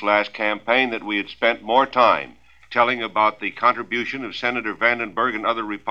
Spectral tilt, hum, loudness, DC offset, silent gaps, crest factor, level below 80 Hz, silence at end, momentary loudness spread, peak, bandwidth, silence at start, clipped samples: -5 dB/octave; none; -21 LUFS; 0.2%; none; 20 dB; -60 dBFS; 0 s; 7 LU; -2 dBFS; 7.6 kHz; 0 s; under 0.1%